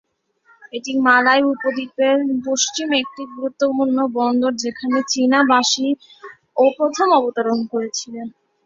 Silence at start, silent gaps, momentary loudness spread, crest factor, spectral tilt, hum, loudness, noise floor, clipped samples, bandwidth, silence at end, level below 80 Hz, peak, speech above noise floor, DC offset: 0.75 s; none; 13 LU; 18 dB; -2 dB/octave; none; -18 LUFS; -57 dBFS; under 0.1%; 7.8 kHz; 0.35 s; -66 dBFS; -2 dBFS; 39 dB; under 0.1%